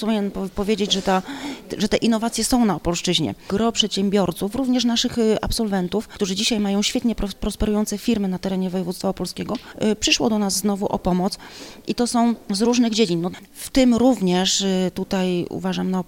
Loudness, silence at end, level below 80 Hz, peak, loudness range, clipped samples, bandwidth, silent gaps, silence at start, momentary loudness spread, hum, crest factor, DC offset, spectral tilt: -21 LUFS; 0.05 s; -40 dBFS; -4 dBFS; 3 LU; under 0.1%; 17 kHz; none; 0 s; 8 LU; none; 18 dB; under 0.1%; -4.5 dB/octave